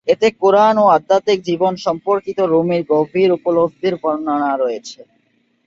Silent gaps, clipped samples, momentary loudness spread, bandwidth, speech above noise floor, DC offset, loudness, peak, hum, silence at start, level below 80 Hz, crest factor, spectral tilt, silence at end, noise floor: none; under 0.1%; 8 LU; 7.6 kHz; 46 dB; under 0.1%; -16 LUFS; -2 dBFS; none; 0.05 s; -60 dBFS; 14 dB; -6 dB/octave; 0.65 s; -61 dBFS